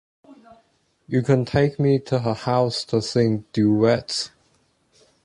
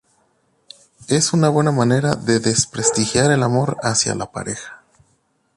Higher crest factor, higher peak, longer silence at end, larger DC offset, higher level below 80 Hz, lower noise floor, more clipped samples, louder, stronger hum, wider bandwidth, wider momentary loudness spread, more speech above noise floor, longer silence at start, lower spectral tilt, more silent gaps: about the same, 18 dB vs 20 dB; second, -4 dBFS vs 0 dBFS; first, 0.95 s vs 0.8 s; neither; about the same, -52 dBFS vs -50 dBFS; about the same, -64 dBFS vs -64 dBFS; neither; second, -21 LUFS vs -18 LUFS; neither; about the same, 11 kHz vs 11.5 kHz; second, 7 LU vs 12 LU; about the same, 43 dB vs 46 dB; second, 0.3 s vs 1 s; first, -6.5 dB/octave vs -4.5 dB/octave; neither